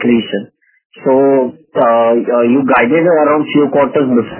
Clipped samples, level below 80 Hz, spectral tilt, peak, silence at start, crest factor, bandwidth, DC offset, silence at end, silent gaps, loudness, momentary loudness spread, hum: under 0.1%; -54 dBFS; -10 dB/octave; 0 dBFS; 0 s; 12 dB; 3.2 kHz; under 0.1%; 0 s; 0.85-0.90 s; -11 LUFS; 6 LU; none